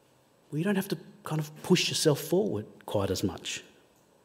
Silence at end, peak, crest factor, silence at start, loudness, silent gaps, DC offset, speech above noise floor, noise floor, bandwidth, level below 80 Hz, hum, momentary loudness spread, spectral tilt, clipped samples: 0.6 s; -12 dBFS; 20 dB; 0.5 s; -30 LUFS; none; under 0.1%; 34 dB; -63 dBFS; 16 kHz; -66 dBFS; none; 12 LU; -4.5 dB/octave; under 0.1%